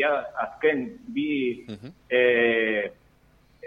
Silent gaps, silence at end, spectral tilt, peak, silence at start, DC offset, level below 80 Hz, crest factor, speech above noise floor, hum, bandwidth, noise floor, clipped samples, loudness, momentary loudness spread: none; 0 s; -6.5 dB/octave; -10 dBFS; 0 s; under 0.1%; -62 dBFS; 16 dB; 34 dB; none; 5.2 kHz; -59 dBFS; under 0.1%; -25 LUFS; 15 LU